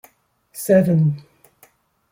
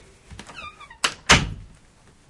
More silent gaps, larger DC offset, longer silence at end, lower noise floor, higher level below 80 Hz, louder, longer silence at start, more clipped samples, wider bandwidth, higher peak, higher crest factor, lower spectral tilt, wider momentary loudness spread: neither; neither; first, 0.9 s vs 0.65 s; first, -59 dBFS vs -54 dBFS; second, -58 dBFS vs -38 dBFS; about the same, -18 LUFS vs -19 LUFS; first, 0.55 s vs 0.3 s; neither; first, 17 kHz vs 11.5 kHz; about the same, -2 dBFS vs -2 dBFS; second, 18 dB vs 24 dB; first, -8 dB/octave vs -2.5 dB/octave; second, 19 LU vs 24 LU